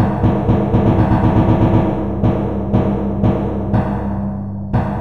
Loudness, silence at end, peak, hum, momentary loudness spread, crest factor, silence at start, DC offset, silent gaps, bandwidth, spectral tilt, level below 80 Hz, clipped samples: -16 LUFS; 0 s; -2 dBFS; none; 7 LU; 14 dB; 0 s; 2%; none; 4.7 kHz; -10.5 dB/octave; -26 dBFS; under 0.1%